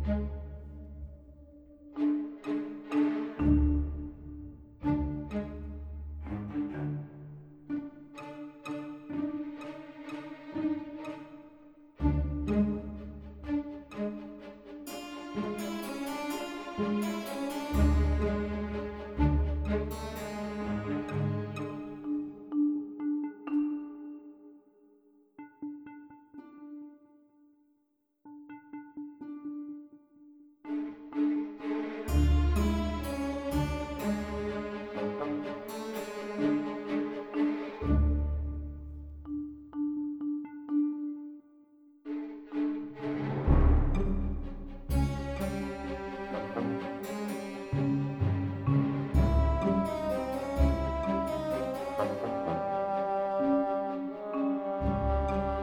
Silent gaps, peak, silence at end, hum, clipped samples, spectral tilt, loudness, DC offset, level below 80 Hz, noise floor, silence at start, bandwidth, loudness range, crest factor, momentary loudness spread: none; -12 dBFS; 0 s; none; under 0.1%; -8 dB/octave; -33 LUFS; under 0.1%; -38 dBFS; -75 dBFS; 0 s; 17 kHz; 9 LU; 20 dB; 17 LU